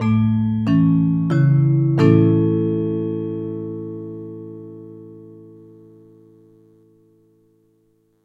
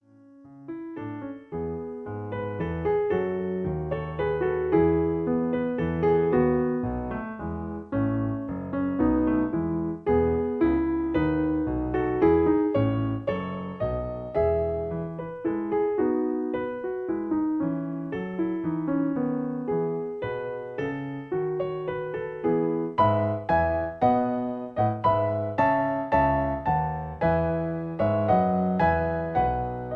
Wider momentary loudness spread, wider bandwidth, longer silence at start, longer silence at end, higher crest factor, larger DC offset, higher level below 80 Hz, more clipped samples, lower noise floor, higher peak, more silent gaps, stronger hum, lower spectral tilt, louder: first, 22 LU vs 10 LU; first, 7 kHz vs 4.8 kHz; second, 0 s vs 0.4 s; first, 2.8 s vs 0 s; about the same, 20 dB vs 16 dB; neither; second, -52 dBFS vs -44 dBFS; neither; first, -62 dBFS vs -52 dBFS; first, 0 dBFS vs -10 dBFS; neither; neither; about the same, -10.5 dB/octave vs -10.5 dB/octave; first, -18 LUFS vs -26 LUFS